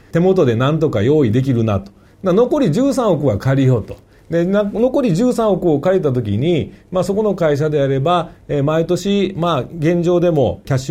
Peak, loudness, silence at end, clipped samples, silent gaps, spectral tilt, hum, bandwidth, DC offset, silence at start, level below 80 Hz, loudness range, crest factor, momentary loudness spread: -2 dBFS; -16 LUFS; 0 s; under 0.1%; none; -7.5 dB/octave; none; 15 kHz; under 0.1%; 0.15 s; -44 dBFS; 2 LU; 12 dB; 6 LU